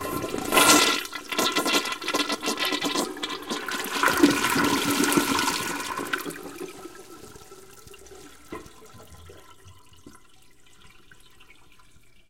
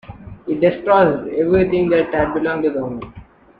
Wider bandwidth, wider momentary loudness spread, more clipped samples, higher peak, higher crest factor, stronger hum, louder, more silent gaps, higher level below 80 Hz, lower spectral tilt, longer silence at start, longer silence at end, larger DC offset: first, 17 kHz vs 5 kHz; first, 23 LU vs 17 LU; neither; about the same, -2 dBFS vs -2 dBFS; first, 26 dB vs 16 dB; neither; second, -23 LUFS vs -17 LUFS; neither; second, -56 dBFS vs -44 dBFS; second, -2 dB/octave vs -9.5 dB/octave; about the same, 0 s vs 0.1 s; first, 2.2 s vs 0.35 s; first, 0.3% vs under 0.1%